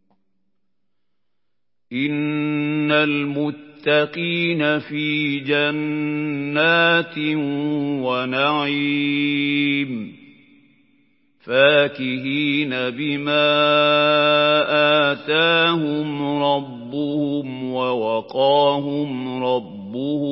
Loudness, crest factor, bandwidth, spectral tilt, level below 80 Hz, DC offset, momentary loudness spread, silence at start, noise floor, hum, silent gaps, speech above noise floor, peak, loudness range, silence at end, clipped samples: -19 LUFS; 18 dB; 5.8 kHz; -10 dB/octave; -72 dBFS; under 0.1%; 10 LU; 1.9 s; -82 dBFS; none; none; 62 dB; -2 dBFS; 5 LU; 0 s; under 0.1%